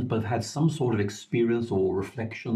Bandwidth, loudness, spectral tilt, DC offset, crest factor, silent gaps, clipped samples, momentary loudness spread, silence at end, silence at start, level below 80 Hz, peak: 13 kHz; -27 LUFS; -7 dB/octave; under 0.1%; 14 dB; none; under 0.1%; 6 LU; 0 s; 0 s; -64 dBFS; -14 dBFS